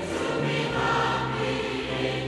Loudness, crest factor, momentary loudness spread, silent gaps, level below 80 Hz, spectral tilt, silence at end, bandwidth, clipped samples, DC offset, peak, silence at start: -26 LUFS; 16 dB; 4 LU; none; -48 dBFS; -5 dB/octave; 0 s; 12 kHz; under 0.1%; under 0.1%; -12 dBFS; 0 s